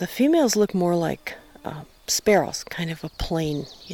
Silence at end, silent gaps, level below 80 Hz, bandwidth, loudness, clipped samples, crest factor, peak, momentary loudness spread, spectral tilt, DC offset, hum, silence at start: 0 s; none; -44 dBFS; 19 kHz; -23 LUFS; under 0.1%; 16 dB; -8 dBFS; 17 LU; -4.5 dB/octave; under 0.1%; none; 0 s